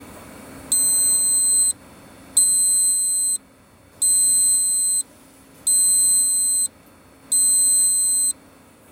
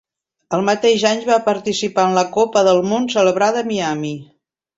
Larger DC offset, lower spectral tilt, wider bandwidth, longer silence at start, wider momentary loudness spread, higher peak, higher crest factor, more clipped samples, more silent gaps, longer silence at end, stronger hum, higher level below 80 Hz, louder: neither; second, 1.5 dB/octave vs -4.5 dB/octave; first, 16.5 kHz vs 8 kHz; second, 0 s vs 0.5 s; about the same, 8 LU vs 7 LU; second, -6 dBFS vs -2 dBFS; about the same, 16 dB vs 16 dB; neither; neither; about the same, 0.6 s vs 0.55 s; neither; about the same, -60 dBFS vs -60 dBFS; about the same, -16 LUFS vs -16 LUFS